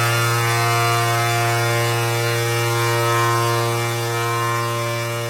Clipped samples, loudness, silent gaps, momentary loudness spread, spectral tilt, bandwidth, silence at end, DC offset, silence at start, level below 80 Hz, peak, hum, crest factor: under 0.1%; -19 LUFS; none; 4 LU; -4 dB/octave; 16 kHz; 0 s; under 0.1%; 0 s; -56 dBFS; -6 dBFS; none; 12 dB